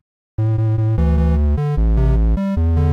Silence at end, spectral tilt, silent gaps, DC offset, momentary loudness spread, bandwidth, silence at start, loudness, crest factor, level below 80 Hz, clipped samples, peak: 0 s; -10.5 dB/octave; none; under 0.1%; 3 LU; 4.7 kHz; 0.4 s; -18 LUFS; 6 dB; -18 dBFS; under 0.1%; -8 dBFS